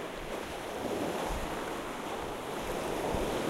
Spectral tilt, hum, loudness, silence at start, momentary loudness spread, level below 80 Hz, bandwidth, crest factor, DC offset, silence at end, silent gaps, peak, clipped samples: -4.5 dB/octave; none; -36 LUFS; 0 s; 5 LU; -48 dBFS; 16 kHz; 16 dB; under 0.1%; 0 s; none; -20 dBFS; under 0.1%